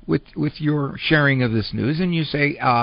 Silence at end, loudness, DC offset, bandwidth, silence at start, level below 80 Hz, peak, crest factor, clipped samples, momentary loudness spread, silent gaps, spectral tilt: 0 s; -20 LUFS; under 0.1%; 5.4 kHz; 0.05 s; -46 dBFS; -2 dBFS; 18 dB; under 0.1%; 7 LU; none; -4.5 dB/octave